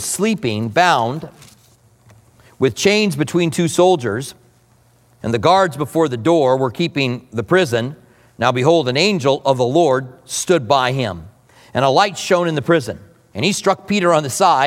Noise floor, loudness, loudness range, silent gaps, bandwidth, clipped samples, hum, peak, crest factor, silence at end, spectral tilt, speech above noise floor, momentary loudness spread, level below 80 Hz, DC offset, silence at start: -53 dBFS; -16 LUFS; 2 LU; none; 16.5 kHz; under 0.1%; none; 0 dBFS; 16 dB; 0 s; -4.5 dB/octave; 37 dB; 11 LU; -56 dBFS; under 0.1%; 0 s